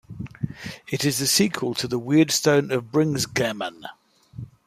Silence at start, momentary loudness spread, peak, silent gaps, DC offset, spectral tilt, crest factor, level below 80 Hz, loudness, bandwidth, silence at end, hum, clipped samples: 0.1 s; 19 LU; -6 dBFS; none; under 0.1%; -4 dB/octave; 18 dB; -56 dBFS; -22 LUFS; 15.5 kHz; 0.2 s; none; under 0.1%